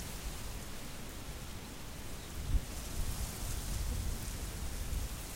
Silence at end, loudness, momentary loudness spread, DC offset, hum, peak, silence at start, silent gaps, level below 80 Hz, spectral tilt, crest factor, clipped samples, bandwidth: 0 s; -42 LUFS; 7 LU; under 0.1%; none; -20 dBFS; 0 s; none; -40 dBFS; -4 dB/octave; 18 dB; under 0.1%; 16 kHz